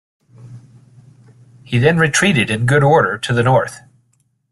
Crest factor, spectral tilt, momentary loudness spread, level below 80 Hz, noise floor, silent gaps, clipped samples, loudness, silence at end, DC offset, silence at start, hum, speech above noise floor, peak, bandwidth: 16 dB; -5 dB/octave; 5 LU; -50 dBFS; -62 dBFS; none; under 0.1%; -14 LUFS; 0.75 s; under 0.1%; 0.45 s; none; 48 dB; -2 dBFS; 12.5 kHz